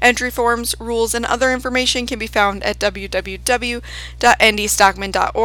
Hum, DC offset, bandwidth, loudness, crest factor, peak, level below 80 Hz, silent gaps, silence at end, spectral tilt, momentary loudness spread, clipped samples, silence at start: none; under 0.1%; over 20 kHz; -17 LUFS; 18 dB; 0 dBFS; -34 dBFS; none; 0 s; -2 dB/octave; 9 LU; under 0.1%; 0 s